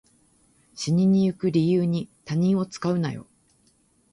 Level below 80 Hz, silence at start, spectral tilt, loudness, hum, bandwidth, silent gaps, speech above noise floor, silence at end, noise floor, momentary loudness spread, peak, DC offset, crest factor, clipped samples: -62 dBFS; 0.75 s; -7.5 dB/octave; -24 LUFS; none; 11 kHz; none; 41 dB; 0.9 s; -63 dBFS; 10 LU; -10 dBFS; under 0.1%; 14 dB; under 0.1%